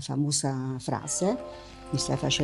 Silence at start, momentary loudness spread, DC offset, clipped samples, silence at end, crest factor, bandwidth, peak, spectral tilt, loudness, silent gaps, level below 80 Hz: 0 s; 9 LU; under 0.1%; under 0.1%; 0 s; 18 dB; 13 kHz; -12 dBFS; -4 dB/octave; -29 LUFS; none; -54 dBFS